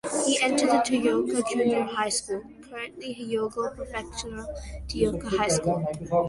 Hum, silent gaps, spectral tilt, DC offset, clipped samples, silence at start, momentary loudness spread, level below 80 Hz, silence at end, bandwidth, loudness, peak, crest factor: none; none; -4 dB/octave; under 0.1%; under 0.1%; 0.05 s; 14 LU; -46 dBFS; 0 s; 11.5 kHz; -26 LUFS; -10 dBFS; 18 dB